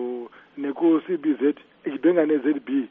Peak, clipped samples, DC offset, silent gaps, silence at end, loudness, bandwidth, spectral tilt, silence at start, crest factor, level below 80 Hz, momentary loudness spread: -8 dBFS; under 0.1%; under 0.1%; none; 0.05 s; -23 LUFS; 3.7 kHz; -5.5 dB/octave; 0 s; 16 dB; -76 dBFS; 12 LU